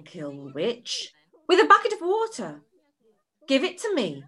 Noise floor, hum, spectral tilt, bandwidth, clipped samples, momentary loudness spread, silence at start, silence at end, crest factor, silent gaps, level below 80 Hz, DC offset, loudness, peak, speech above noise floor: -68 dBFS; none; -3.5 dB/octave; 12 kHz; under 0.1%; 20 LU; 0.15 s; 0.05 s; 22 dB; none; -78 dBFS; under 0.1%; -23 LUFS; -4 dBFS; 44 dB